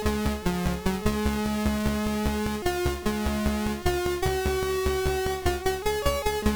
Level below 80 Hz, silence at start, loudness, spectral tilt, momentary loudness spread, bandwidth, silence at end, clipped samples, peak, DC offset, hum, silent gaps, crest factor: -34 dBFS; 0 s; -27 LUFS; -5 dB/octave; 2 LU; over 20 kHz; 0 s; under 0.1%; -12 dBFS; 0.2%; none; none; 14 dB